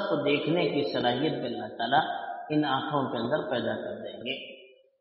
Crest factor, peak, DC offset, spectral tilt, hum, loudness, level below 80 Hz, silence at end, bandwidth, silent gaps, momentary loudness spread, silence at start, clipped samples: 18 dB; -10 dBFS; under 0.1%; -3.5 dB/octave; none; -29 LUFS; -70 dBFS; 0.35 s; 5.8 kHz; none; 9 LU; 0 s; under 0.1%